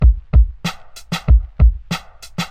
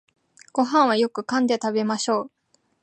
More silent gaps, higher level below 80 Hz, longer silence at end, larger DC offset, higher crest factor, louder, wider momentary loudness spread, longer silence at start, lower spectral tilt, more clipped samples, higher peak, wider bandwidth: neither; first, -16 dBFS vs -78 dBFS; second, 0 s vs 0.55 s; neither; about the same, 12 dB vs 16 dB; first, -18 LUFS vs -22 LUFS; first, 13 LU vs 8 LU; second, 0 s vs 0.55 s; first, -6 dB/octave vs -4 dB/octave; neither; first, -2 dBFS vs -6 dBFS; about the same, 9.4 kHz vs 9.2 kHz